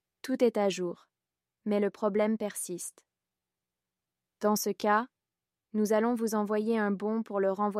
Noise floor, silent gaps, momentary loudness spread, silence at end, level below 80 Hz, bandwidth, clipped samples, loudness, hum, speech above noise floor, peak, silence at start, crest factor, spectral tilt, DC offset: under -90 dBFS; none; 10 LU; 0 s; -82 dBFS; 15.5 kHz; under 0.1%; -30 LUFS; none; over 61 dB; -12 dBFS; 0.25 s; 18 dB; -5 dB/octave; under 0.1%